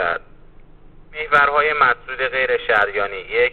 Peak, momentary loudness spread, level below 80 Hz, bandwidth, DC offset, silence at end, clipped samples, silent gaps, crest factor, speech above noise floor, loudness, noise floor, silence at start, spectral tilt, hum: -4 dBFS; 11 LU; -44 dBFS; 7.2 kHz; under 0.1%; 0 s; under 0.1%; none; 16 dB; 25 dB; -18 LUFS; -43 dBFS; 0 s; -4.5 dB/octave; none